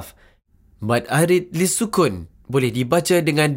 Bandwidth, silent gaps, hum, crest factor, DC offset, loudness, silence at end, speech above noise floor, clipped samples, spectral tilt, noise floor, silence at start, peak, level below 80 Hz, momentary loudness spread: 16 kHz; none; none; 16 dB; under 0.1%; -19 LUFS; 0 s; 37 dB; under 0.1%; -5 dB/octave; -55 dBFS; 0 s; -4 dBFS; -52 dBFS; 6 LU